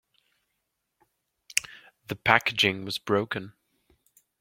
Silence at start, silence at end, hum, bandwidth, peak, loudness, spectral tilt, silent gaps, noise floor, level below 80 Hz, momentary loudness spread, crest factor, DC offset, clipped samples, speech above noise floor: 1.55 s; 0.9 s; none; 16.5 kHz; -2 dBFS; -26 LUFS; -3 dB/octave; none; -80 dBFS; -66 dBFS; 23 LU; 30 dB; under 0.1%; under 0.1%; 54 dB